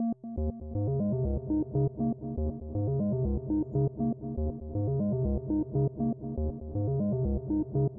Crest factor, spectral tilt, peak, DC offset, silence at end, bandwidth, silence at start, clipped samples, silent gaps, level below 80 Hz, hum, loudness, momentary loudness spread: 12 dB; -16 dB/octave; -18 dBFS; under 0.1%; 0 s; 1.6 kHz; 0 s; under 0.1%; none; -40 dBFS; none; -31 LUFS; 5 LU